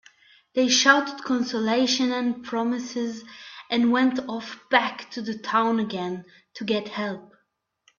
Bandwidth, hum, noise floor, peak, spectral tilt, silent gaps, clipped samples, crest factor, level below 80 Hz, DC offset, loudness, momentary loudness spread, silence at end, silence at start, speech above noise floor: 7.4 kHz; none; -73 dBFS; -2 dBFS; -3 dB/octave; none; under 0.1%; 24 dB; -70 dBFS; under 0.1%; -24 LUFS; 15 LU; 0.75 s; 0.55 s; 48 dB